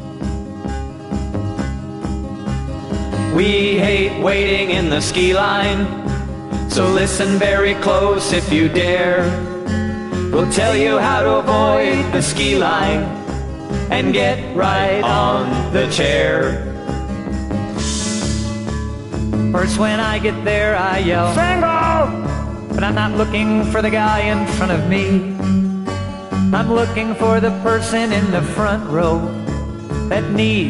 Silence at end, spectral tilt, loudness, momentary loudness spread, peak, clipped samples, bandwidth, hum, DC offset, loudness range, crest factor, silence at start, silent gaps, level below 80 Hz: 0 s; -5 dB/octave; -17 LUFS; 10 LU; -2 dBFS; under 0.1%; 11.5 kHz; none; under 0.1%; 3 LU; 14 dB; 0 s; none; -30 dBFS